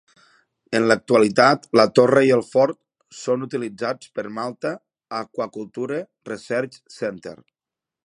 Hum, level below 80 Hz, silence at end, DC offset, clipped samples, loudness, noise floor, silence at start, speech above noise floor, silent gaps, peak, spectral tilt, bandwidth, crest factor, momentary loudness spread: none; -66 dBFS; 0.7 s; under 0.1%; under 0.1%; -21 LUFS; -88 dBFS; 0.7 s; 68 dB; none; 0 dBFS; -5.5 dB/octave; 11 kHz; 22 dB; 17 LU